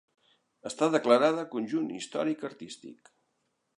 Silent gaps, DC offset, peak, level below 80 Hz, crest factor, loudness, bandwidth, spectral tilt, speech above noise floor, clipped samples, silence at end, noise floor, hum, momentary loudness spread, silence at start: none; under 0.1%; -8 dBFS; -82 dBFS; 22 dB; -28 LUFS; 11 kHz; -5 dB/octave; 49 dB; under 0.1%; 0.85 s; -78 dBFS; none; 21 LU; 0.65 s